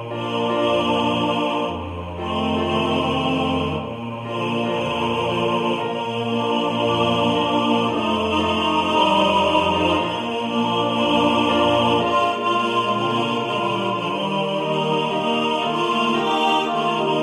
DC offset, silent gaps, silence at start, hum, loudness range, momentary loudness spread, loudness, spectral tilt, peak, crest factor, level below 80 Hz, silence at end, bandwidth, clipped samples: under 0.1%; none; 0 s; none; 4 LU; 6 LU; -20 LUFS; -5.5 dB/octave; -4 dBFS; 16 dB; -50 dBFS; 0 s; 13 kHz; under 0.1%